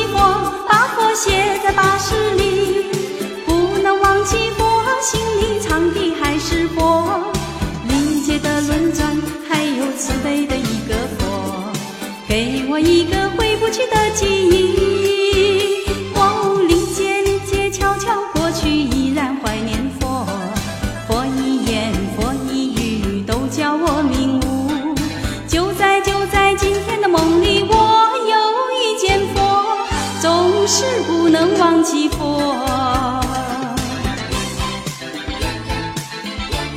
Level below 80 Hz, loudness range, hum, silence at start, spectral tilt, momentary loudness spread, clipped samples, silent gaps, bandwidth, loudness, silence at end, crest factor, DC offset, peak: -30 dBFS; 5 LU; none; 0 s; -4 dB/octave; 9 LU; under 0.1%; none; 16.5 kHz; -17 LUFS; 0 s; 16 dB; under 0.1%; 0 dBFS